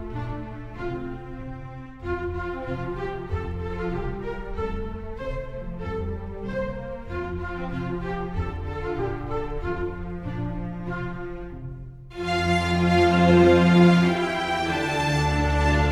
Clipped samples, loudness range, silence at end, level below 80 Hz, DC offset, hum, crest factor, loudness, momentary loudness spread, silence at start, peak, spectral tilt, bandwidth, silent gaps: under 0.1%; 13 LU; 0 s; -36 dBFS; under 0.1%; none; 20 dB; -25 LUFS; 18 LU; 0 s; -6 dBFS; -7 dB/octave; 11 kHz; none